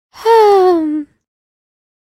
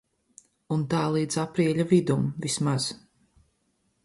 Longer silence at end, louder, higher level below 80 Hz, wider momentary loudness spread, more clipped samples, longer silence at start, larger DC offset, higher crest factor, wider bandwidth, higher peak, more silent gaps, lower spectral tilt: about the same, 1.1 s vs 1.1 s; first, -11 LUFS vs -26 LUFS; about the same, -60 dBFS vs -62 dBFS; first, 12 LU vs 8 LU; neither; second, 0.15 s vs 0.7 s; neither; about the same, 14 dB vs 18 dB; first, 15.5 kHz vs 11.5 kHz; first, 0 dBFS vs -8 dBFS; neither; second, -4 dB/octave vs -5.5 dB/octave